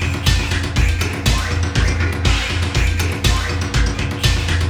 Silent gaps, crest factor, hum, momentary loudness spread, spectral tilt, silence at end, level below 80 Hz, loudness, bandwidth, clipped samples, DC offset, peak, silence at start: none; 16 dB; none; 2 LU; -4.5 dB/octave; 0 s; -22 dBFS; -18 LUFS; 19 kHz; under 0.1%; under 0.1%; -2 dBFS; 0 s